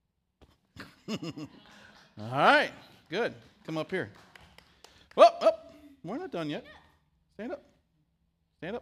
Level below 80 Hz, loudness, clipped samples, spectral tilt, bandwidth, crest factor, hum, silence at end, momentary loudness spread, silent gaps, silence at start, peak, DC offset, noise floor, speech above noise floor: -72 dBFS; -28 LUFS; under 0.1%; -5 dB/octave; 13 kHz; 26 dB; none; 0 s; 25 LU; none; 0.8 s; -4 dBFS; under 0.1%; -75 dBFS; 43 dB